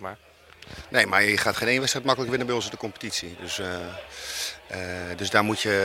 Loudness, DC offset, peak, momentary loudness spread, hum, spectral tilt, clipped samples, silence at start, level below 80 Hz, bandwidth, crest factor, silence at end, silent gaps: -25 LUFS; under 0.1%; -2 dBFS; 14 LU; none; -3 dB/octave; under 0.1%; 0 s; -58 dBFS; 16.5 kHz; 24 dB; 0 s; none